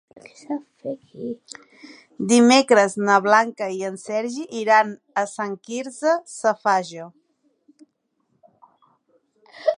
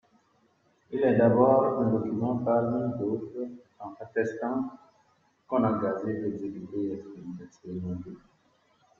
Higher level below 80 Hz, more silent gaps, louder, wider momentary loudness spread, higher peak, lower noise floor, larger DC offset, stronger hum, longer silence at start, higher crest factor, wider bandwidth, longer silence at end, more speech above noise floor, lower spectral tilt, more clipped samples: second, -76 dBFS vs -66 dBFS; neither; first, -20 LUFS vs -28 LUFS; about the same, 18 LU vs 20 LU; first, -2 dBFS vs -8 dBFS; first, -71 dBFS vs -67 dBFS; neither; neither; second, 0.5 s vs 0.9 s; about the same, 20 dB vs 22 dB; first, 11 kHz vs 7.2 kHz; second, 0.05 s vs 0.8 s; first, 50 dB vs 40 dB; second, -3.5 dB/octave vs -10 dB/octave; neither